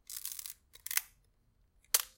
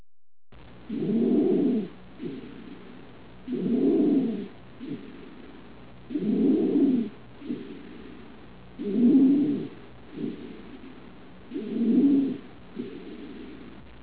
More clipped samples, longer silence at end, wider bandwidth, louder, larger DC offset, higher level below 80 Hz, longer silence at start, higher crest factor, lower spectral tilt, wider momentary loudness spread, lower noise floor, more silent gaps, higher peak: neither; about the same, 0.1 s vs 0 s; first, 17 kHz vs 4 kHz; second, -36 LUFS vs -25 LUFS; second, under 0.1% vs 0.4%; second, -72 dBFS vs -60 dBFS; about the same, 0.1 s vs 0 s; first, 30 dB vs 16 dB; second, 3.5 dB/octave vs -8.5 dB/octave; second, 15 LU vs 24 LU; first, -71 dBFS vs -48 dBFS; neither; about the same, -10 dBFS vs -12 dBFS